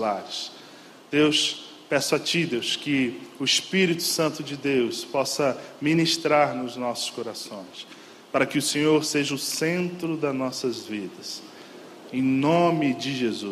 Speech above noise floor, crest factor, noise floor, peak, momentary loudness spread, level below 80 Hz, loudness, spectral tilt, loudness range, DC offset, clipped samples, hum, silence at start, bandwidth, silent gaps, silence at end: 22 dB; 18 dB; -47 dBFS; -6 dBFS; 15 LU; -70 dBFS; -24 LUFS; -4 dB/octave; 3 LU; under 0.1%; under 0.1%; none; 0 s; 15 kHz; none; 0 s